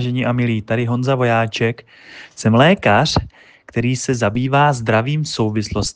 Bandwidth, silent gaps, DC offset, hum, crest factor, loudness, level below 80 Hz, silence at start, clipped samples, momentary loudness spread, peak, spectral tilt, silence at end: 9.6 kHz; none; under 0.1%; none; 16 dB; -17 LUFS; -42 dBFS; 0 s; under 0.1%; 9 LU; 0 dBFS; -5.5 dB/octave; 0.05 s